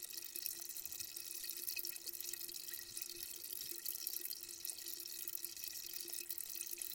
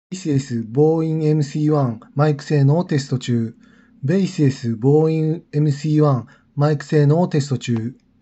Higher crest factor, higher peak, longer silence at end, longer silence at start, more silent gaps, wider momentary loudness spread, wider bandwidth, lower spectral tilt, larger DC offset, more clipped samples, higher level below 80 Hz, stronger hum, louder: first, 26 dB vs 14 dB; second, -20 dBFS vs -4 dBFS; second, 0 s vs 0.3 s; about the same, 0 s vs 0.1 s; neither; second, 3 LU vs 7 LU; first, 17 kHz vs 8.2 kHz; second, 1.5 dB/octave vs -8 dB/octave; neither; neither; second, -80 dBFS vs -64 dBFS; neither; second, -44 LUFS vs -19 LUFS